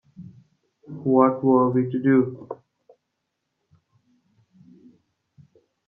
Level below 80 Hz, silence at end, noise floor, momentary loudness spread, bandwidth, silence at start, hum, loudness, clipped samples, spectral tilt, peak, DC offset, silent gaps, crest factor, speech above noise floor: -70 dBFS; 3.35 s; -79 dBFS; 22 LU; 3.3 kHz; 0.2 s; none; -20 LUFS; under 0.1%; -12 dB/octave; -4 dBFS; under 0.1%; none; 22 dB; 59 dB